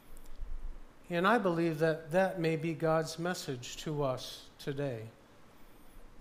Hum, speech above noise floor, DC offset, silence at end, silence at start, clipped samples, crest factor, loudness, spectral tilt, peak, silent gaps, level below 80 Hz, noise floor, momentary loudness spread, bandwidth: none; 22 dB; under 0.1%; 0 s; 0.05 s; under 0.1%; 20 dB; -33 LUFS; -5.5 dB/octave; -14 dBFS; none; -50 dBFS; -55 dBFS; 20 LU; 15.5 kHz